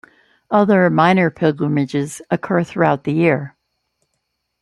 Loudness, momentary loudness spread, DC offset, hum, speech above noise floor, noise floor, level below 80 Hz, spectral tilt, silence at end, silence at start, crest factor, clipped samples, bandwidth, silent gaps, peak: -17 LUFS; 10 LU; under 0.1%; none; 57 dB; -73 dBFS; -60 dBFS; -7 dB/octave; 1.15 s; 0.5 s; 16 dB; under 0.1%; 12 kHz; none; -2 dBFS